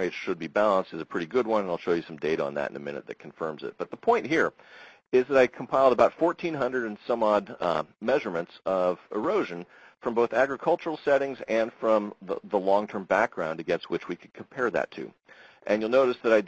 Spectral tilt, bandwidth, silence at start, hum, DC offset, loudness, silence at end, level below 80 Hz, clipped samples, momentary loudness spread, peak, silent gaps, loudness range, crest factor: -6 dB/octave; 8.2 kHz; 0 s; none; under 0.1%; -27 LUFS; 0 s; -66 dBFS; under 0.1%; 12 LU; -8 dBFS; none; 4 LU; 20 dB